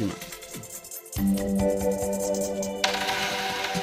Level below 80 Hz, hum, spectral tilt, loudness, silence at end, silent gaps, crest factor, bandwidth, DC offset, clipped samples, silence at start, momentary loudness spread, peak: -46 dBFS; none; -4 dB/octave; -27 LUFS; 0 s; none; 22 dB; 16 kHz; under 0.1%; under 0.1%; 0 s; 12 LU; -6 dBFS